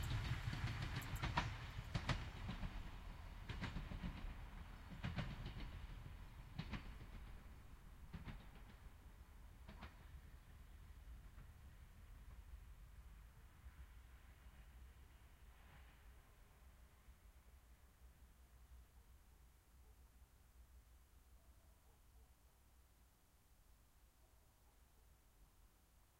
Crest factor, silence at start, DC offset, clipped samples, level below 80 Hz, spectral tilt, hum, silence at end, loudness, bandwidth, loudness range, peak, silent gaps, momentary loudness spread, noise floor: 30 dB; 0 s; under 0.1%; under 0.1%; -58 dBFS; -5.5 dB/octave; none; 0 s; -52 LUFS; 16 kHz; 20 LU; -24 dBFS; none; 22 LU; -72 dBFS